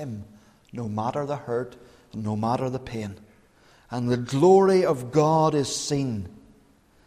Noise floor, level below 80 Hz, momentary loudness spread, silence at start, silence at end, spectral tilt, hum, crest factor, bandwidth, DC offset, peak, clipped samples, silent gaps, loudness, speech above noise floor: -58 dBFS; -58 dBFS; 20 LU; 0 s; 0.75 s; -6 dB/octave; none; 18 dB; 13.5 kHz; under 0.1%; -8 dBFS; under 0.1%; none; -24 LUFS; 35 dB